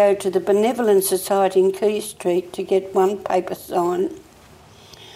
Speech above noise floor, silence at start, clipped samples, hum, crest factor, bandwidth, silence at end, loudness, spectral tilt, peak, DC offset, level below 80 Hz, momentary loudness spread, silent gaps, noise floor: 28 dB; 0 s; under 0.1%; none; 14 dB; 16 kHz; 0.05 s; -20 LUFS; -4.5 dB/octave; -6 dBFS; under 0.1%; -60 dBFS; 7 LU; none; -47 dBFS